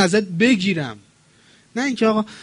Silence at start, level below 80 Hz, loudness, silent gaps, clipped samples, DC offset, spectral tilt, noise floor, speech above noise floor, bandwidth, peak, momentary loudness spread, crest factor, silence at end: 0 s; -62 dBFS; -19 LUFS; none; under 0.1%; under 0.1%; -5 dB/octave; -54 dBFS; 35 dB; 10.5 kHz; -4 dBFS; 12 LU; 16 dB; 0 s